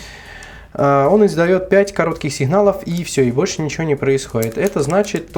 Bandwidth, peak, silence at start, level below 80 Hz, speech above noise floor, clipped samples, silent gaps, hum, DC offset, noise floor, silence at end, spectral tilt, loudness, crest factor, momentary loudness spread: 20 kHz; 0 dBFS; 0 s; -44 dBFS; 21 dB; under 0.1%; none; none; under 0.1%; -36 dBFS; 0 s; -6 dB/octave; -16 LUFS; 16 dB; 10 LU